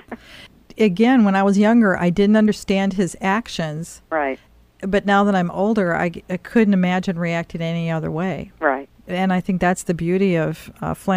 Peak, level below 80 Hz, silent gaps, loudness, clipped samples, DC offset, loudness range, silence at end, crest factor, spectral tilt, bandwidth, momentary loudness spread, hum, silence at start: -4 dBFS; -48 dBFS; none; -19 LUFS; under 0.1%; under 0.1%; 4 LU; 0 s; 16 dB; -6.5 dB/octave; 14.5 kHz; 12 LU; none; 0.1 s